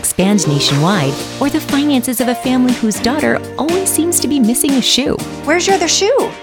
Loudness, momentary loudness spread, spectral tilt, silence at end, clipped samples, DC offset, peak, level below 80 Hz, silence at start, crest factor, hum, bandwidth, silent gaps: -13 LUFS; 6 LU; -3.5 dB/octave; 0 s; under 0.1%; under 0.1%; -2 dBFS; -44 dBFS; 0 s; 12 dB; none; 19.5 kHz; none